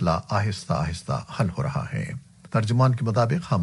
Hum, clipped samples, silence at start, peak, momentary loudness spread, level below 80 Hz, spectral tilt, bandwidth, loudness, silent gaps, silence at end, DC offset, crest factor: none; under 0.1%; 0 s; -8 dBFS; 9 LU; -46 dBFS; -7 dB/octave; 11.5 kHz; -25 LUFS; none; 0 s; under 0.1%; 16 dB